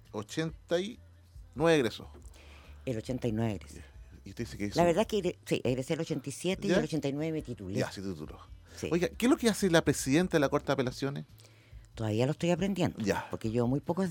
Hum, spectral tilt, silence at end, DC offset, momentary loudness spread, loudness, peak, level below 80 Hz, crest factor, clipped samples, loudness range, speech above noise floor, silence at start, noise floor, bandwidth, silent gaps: none; -5.5 dB/octave; 0 s; under 0.1%; 17 LU; -31 LUFS; -10 dBFS; -54 dBFS; 22 dB; under 0.1%; 4 LU; 22 dB; 0.1 s; -53 dBFS; 17.5 kHz; none